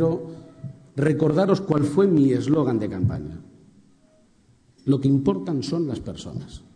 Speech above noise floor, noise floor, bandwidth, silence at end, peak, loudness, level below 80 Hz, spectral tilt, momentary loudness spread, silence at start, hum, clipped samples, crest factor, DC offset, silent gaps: 36 dB; -58 dBFS; 10 kHz; 0.15 s; -6 dBFS; -22 LUFS; -50 dBFS; -8 dB/octave; 19 LU; 0 s; none; under 0.1%; 18 dB; under 0.1%; none